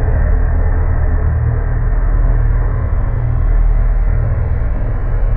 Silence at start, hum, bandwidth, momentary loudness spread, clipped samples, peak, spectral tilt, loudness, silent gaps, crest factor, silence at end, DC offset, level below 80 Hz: 0 s; none; 2.5 kHz; 3 LU; under 0.1%; -4 dBFS; -12.5 dB/octave; -17 LUFS; none; 10 dB; 0 s; under 0.1%; -14 dBFS